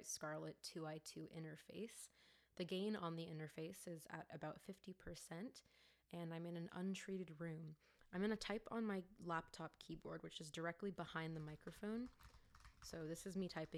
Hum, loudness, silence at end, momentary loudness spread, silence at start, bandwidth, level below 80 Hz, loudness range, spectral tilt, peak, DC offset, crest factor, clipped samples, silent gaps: none; -51 LUFS; 0 s; 11 LU; 0 s; 15.5 kHz; -74 dBFS; 4 LU; -5 dB/octave; -32 dBFS; under 0.1%; 20 dB; under 0.1%; none